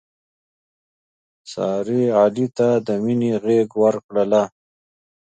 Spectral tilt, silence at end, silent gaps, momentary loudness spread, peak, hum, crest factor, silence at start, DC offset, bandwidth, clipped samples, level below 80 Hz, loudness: -7.5 dB/octave; 0.75 s; 4.04-4.09 s; 7 LU; -4 dBFS; none; 18 dB; 1.45 s; under 0.1%; 9 kHz; under 0.1%; -66 dBFS; -19 LUFS